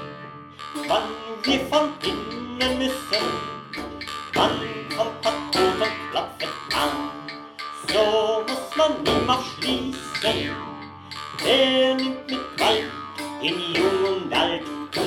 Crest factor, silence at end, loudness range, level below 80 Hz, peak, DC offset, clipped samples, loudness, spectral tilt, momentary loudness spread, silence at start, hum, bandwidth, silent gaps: 20 dB; 0 s; 3 LU; -50 dBFS; -4 dBFS; under 0.1%; under 0.1%; -23 LUFS; -3.5 dB/octave; 13 LU; 0 s; none; 19 kHz; none